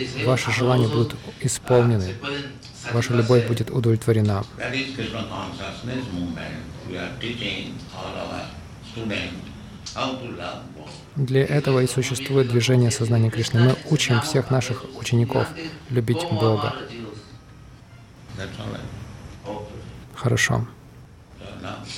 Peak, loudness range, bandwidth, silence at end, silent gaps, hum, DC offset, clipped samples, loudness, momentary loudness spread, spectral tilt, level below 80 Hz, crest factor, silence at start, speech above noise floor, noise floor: -6 dBFS; 10 LU; 14.5 kHz; 0 s; none; none; under 0.1%; under 0.1%; -23 LUFS; 18 LU; -5.5 dB/octave; -48 dBFS; 18 dB; 0 s; 23 dB; -45 dBFS